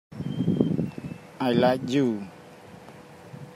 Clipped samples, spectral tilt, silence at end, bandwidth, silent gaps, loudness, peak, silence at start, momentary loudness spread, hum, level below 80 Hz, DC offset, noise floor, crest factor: under 0.1%; -7.5 dB/octave; 0 s; 16 kHz; none; -26 LUFS; -6 dBFS; 0.1 s; 24 LU; none; -62 dBFS; under 0.1%; -47 dBFS; 20 dB